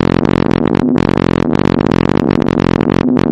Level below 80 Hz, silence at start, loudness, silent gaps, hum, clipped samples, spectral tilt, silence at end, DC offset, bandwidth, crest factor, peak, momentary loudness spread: -30 dBFS; 0 s; -12 LUFS; none; none; 0.1%; -8 dB/octave; 0 s; under 0.1%; 9 kHz; 12 dB; 0 dBFS; 1 LU